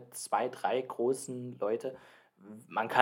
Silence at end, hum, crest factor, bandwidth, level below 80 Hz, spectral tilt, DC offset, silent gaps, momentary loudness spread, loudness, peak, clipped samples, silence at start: 0 s; none; 28 dB; 16.5 kHz; -88 dBFS; -4 dB/octave; under 0.1%; none; 17 LU; -34 LUFS; -6 dBFS; under 0.1%; 0 s